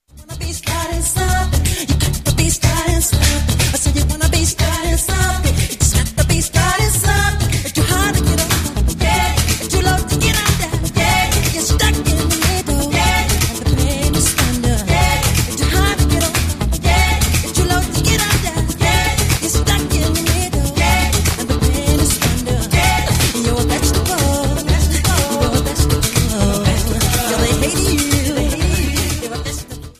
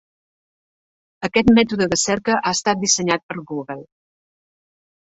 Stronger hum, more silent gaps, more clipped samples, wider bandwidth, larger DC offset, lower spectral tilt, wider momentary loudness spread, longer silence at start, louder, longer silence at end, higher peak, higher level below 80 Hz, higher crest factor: neither; second, none vs 3.23-3.29 s; neither; first, 15.5 kHz vs 8 kHz; neither; about the same, -4 dB/octave vs -3.5 dB/octave; second, 4 LU vs 14 LU; second, 0.15 s vs 1.2 s; first, -15 LUFS vs -18 LUFS; second, 0.1 s vs 1.3 s; about the same, 0 dBFS vs -2 dBFS; first, -20 dBFS vs -50 dBFS; second, 14 dB vs 20 dB